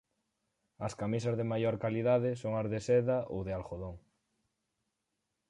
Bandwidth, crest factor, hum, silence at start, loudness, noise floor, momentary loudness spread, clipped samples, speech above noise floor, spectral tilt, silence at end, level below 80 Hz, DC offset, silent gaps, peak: 11 kHz; 18 dB; none; 0.8 s; -33 LUFS; -85 dBFS; 12 LU; under 0.1%; 52 dB; -7.5 dB/octave; 1.5 s; -60 dBFS; under 0.1%; none; -18 dBFS